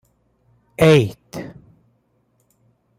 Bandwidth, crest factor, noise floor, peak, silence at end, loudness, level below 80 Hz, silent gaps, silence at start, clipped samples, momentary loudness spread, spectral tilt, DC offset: 16 kHz; 20 dB; -64 dBFS; -2 dBFS; 1.5 s; -16 LUFS; -52 dBFS; none; 0.8 s; under 0.1%; 25 LU; -6.5 dB/octave; under 0.1%